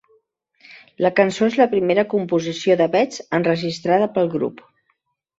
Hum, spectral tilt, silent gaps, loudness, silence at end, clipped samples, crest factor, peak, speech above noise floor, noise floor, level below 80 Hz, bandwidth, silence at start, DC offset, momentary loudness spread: none; -6 dB/octave; none; -19 LUFS; 0.85 s; under 0.1%; 18 dB; -2 dBFS; 51 dB; -70 dBFS; -64 dBFS; 8 kHz; 0.7 s; under 0.1%; 5 LU